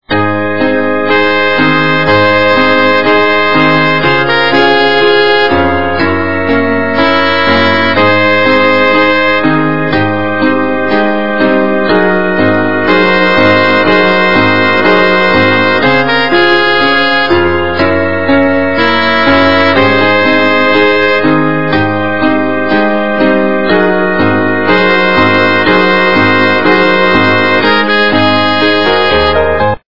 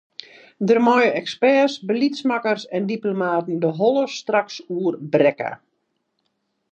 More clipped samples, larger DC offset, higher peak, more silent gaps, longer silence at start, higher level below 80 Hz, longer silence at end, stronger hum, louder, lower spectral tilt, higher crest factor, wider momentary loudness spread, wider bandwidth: first, 0.6% vs under 0.1%; first, 7% vs under 0.1%; first, 0 dBFS vs -4 dBFS; neither; second, 0 s vs 0.6 s; first, -38 dBFS vs -78 dBFS; second, 0 s vs 1.15 s; neither; first, -8 LUFS vs -20 LUFS; about the same, -6.5 dB/octave vs -6 dB/octave; second, 10 dB vs 18 dB; second, 4 LU vs 11 LU; second, 6 kHz vs 8.4 kHz